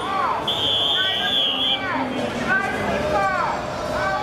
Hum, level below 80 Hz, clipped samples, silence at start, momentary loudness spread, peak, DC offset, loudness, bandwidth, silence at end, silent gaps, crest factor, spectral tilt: none; -46 dBFS; under 0.1%; 0 s; 7 LU; -10 dBFS; under 0.1%; -20 LUFS; 15.5 kHz; 0 s; none; 12 dB; -3.5 dB/octave